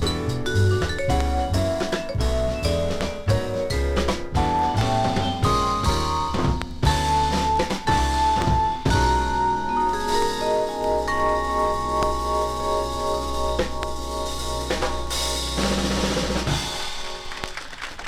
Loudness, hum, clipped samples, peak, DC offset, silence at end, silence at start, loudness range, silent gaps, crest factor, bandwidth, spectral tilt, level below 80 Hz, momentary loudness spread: -23 LUFS; none; under 0.1%; -6 dBFS; under 0.1%; 0 s; 0 s; 4 LU; none; 16 dB; 15.5 kHz; -5 dB/octave; -30 dBFS; 7 LU